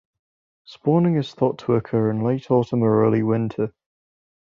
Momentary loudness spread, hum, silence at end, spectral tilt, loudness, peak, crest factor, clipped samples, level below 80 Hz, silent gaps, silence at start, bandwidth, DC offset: 7 LU; none; 0.9 s; -9.5 dB/octave; -21 LUFS; -6 dBFS; 16 dB; under 0.1%; -60 dBFS; none; 0.7 s; 7.2 kHz; under 0.1%